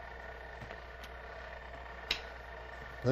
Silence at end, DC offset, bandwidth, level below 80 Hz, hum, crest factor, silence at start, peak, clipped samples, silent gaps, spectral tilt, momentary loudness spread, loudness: 0 s; under 0.1%; 15.5 kHz; -52 dBFS; none; 26 dB; 0 s; -16 dBFS; under 0.1%; none; -5 dB/octave; 10 LU; -43 LUFS